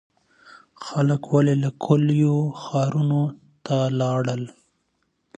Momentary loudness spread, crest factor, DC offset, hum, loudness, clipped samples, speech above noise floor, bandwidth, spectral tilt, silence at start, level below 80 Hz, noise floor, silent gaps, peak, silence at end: 11 LU; 18 dB; under 0.1%; none; -22 LUFS; under 0.1%; 51 dB; 8.4 kHz; -8 dB/octave; 0.8 s; -66 dBFS; -71 dBFS; none; -6 dBFS; 0.9 s